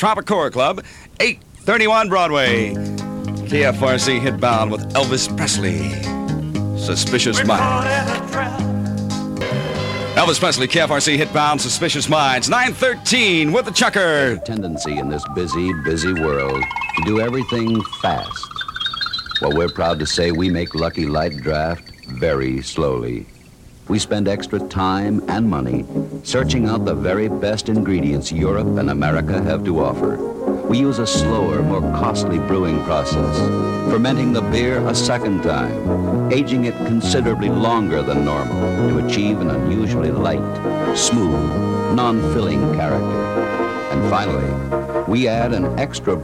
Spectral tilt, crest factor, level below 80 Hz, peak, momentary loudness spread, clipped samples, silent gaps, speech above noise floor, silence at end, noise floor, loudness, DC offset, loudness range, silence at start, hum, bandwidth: -4.5 dB/octave; 18 dB; -36 dBFS; -2 dBFS; 7 LU; under 0.1%; none; 25 dB; 0 s; -43 dBFS; -18 LUFS; under 0.1%; 4 LU; 0 s; none; 15.5 kHz